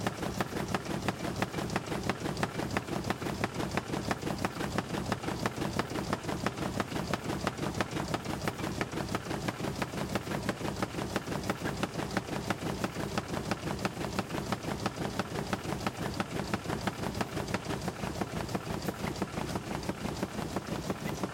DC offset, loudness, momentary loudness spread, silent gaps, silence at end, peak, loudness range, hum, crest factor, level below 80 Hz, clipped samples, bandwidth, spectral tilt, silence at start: under 0.1%; -35 LUFS; 2 LU; none; 0 s; -14 dBFS; 1 LU; none; 20 dB; -52 dBFS; under 0.1%; 17 kHz; -5 dB/octave; 0 s